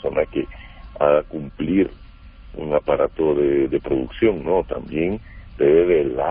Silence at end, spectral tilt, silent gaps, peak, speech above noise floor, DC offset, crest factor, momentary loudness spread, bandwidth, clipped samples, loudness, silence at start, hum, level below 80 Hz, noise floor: 0 s; -12 dB/octave; none; -4 dBFS; 22 dB; under 0.1%; 16 dB; 15 LU; 4 kHz; under 0.1%; -20 LUFS; 0.05 s; none; -40 dBFS; -42 dBFS